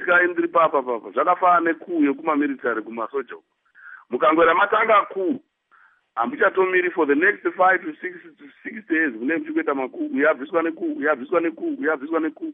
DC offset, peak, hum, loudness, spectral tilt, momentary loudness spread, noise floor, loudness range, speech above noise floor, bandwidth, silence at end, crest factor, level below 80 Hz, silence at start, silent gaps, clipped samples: under 0.1%; -6 dBFS; none; -21 LUFS; -9 dB/octave; 12 LU; -57 dBFS; 3 LU; 36 dB; 3.8 kHz; 0 s; 16 dB; -68 dBFS; 0 s; none; under 0.1%